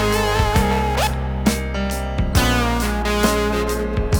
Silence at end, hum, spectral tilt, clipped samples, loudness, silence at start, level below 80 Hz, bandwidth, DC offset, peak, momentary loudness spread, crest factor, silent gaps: 0 s; none; -5 dB/octave; under 0.1%; -19 LUFS; 0 s; -24 dBFS; over 20 kHz; 0.4%; -2 dBFS; 5 LU; 18 dB; none